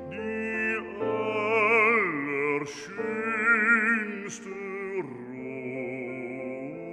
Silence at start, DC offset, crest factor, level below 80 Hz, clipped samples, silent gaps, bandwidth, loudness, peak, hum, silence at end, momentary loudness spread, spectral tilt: 0 s; under 0.1%; 18 dB; -68 dBFS; under 0.1%; none; 10 kHz; -27 LUFS; -10 dBFS; none; 0 s; 16 LU; -5 dB/octave